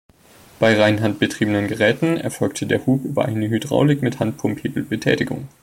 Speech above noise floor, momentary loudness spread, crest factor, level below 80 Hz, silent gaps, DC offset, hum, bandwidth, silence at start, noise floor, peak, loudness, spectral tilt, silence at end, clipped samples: 29 dB; 7 LU; 18 dB; -54 dBFS; none; under 0.1%; none; 16.5 kHz; 0.6 s; -48 dBFS; -2 dBFS; -20 LUFS; -6 dB/octave; 0.15 s; under 0.1%